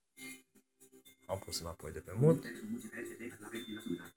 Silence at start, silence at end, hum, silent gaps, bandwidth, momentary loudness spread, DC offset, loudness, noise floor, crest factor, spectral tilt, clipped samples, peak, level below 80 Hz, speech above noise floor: 0.2 s; 0.05 s; none; none; 20 kHz; 19 LU; under 0.1%; -38 LUFS; -67 dBFS; 24 dB; -6 dB/octave; under 0.1%; -16 dBFS; -68 dBFS; 30 dB